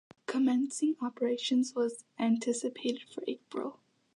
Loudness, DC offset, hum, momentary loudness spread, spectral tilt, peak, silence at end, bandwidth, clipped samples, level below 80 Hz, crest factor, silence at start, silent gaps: -32 LUFS; under 0.1%; none; 10 LU; -4 dB/octave; -18 dBFS; 0.45 s; 11 kHz; under 0.1%; -86 dBFS; 14 dB; 0.3 s; none